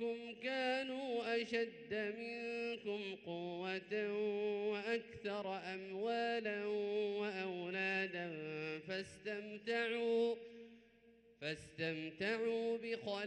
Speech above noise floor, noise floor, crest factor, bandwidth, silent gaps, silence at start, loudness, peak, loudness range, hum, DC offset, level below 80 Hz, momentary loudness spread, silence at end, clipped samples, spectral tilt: 26 dB; -68 dBFS; 16 dB; 10 kHz; none; 0 s; -41 LUFS; -26 dBFS; 2 LU; none; under 0.1%; -80 dBFS; 8 LU; 0 s; under 0.1%; -5 dB/octave